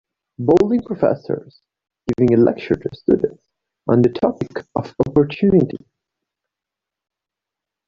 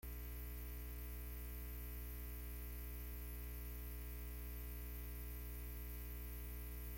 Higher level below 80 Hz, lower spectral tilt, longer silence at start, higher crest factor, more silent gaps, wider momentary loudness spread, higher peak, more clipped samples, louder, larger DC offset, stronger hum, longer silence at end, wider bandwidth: about the same, -50 dBFS vs -50 dBFS; first, -9 dB/octave vs -5 dB/octave; first, 0.4 s vs 0.05 s; first, 18 dB vs 10 dB; neither; first, 12 LU vs 0 LU; first, -2 dBFS vs -38 dBFS; neither; first, -18 LUFS vs -50 LUFS; neither; second, none vs 60 Hz at -50 dBFS; first, 2.1 s vs 0 s; second, 7.2 kHz vs 17 kHz